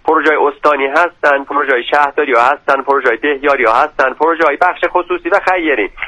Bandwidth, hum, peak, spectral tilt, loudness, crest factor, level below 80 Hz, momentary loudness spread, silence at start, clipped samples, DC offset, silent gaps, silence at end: 11 kHz; none; 0 dBFS; -4 dB/octave; -12 LUFS; 12 dB; -46 dBFS; 3 LU; 0.05 s; under 0.1%; under 0.1%; none; 0 s